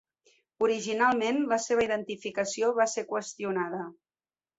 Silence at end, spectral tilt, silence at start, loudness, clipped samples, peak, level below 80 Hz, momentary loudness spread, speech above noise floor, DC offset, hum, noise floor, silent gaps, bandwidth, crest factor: 0.65 s; -3.5 dB/octave; 0.6 s; -29 LUFS; under 0.1%; -12 dBFS; -70 dBFS; 9 LU; over 62 dB; under 0.1%; none; under -90 dBFS; none; 8 kHz; 18 dB